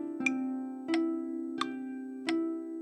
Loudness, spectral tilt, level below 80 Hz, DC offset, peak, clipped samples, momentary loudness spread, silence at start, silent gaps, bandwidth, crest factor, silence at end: -34 LUFS; -3.5 dB/octave; under -90 dBFS; under 0.1%; -16 dBFS; under 0.1%; 7 LU; 0 s; none; 10.5 kHz; 18 dB; 0 s